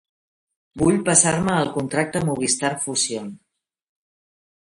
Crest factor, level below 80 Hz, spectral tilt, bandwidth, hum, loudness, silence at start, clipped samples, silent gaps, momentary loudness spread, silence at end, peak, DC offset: 22 dB; -52 dBFS; -3.5 dB/octave; 11.5 kHz; none; -20 LUFS; 0.75 s; under 0.1%; none; 8 LU; 1.4 s; -2 dBFS; under 0.1%